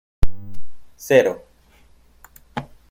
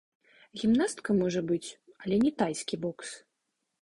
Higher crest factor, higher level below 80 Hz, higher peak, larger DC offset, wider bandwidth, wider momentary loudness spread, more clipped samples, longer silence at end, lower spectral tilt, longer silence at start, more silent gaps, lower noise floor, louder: about the same, 18 dB vs 16 dB; first, -34 dBFS vs -64 dBFS; first, -2 dBFS vs -14 dBFS; neither; first, 16.5 kHz vs 11.5 kHz; first, 25 LU vs 16 LU; neither; second, 0.25 s vs 0.65 s; about the same, -5.5 dB/octave vs -5.5 dB/octave; second, 0.2 s vs 0.55 s; neither; second, -52 dBFS vs -82 dBFS; first, -21 LUFS vs -29 LUFS